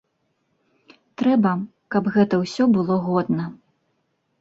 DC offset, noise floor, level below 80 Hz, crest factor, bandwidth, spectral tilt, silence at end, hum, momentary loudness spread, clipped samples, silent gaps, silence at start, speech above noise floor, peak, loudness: under 0.1%; -71 dBFS; -64 dBFS; 16 dB; 7.8 kHz; -7.5 dB/octave; 0.85 s; none; 7 LU; under 0.1%; none; 1.2 s; 51 dB; -6 dBFS; -21 LUFS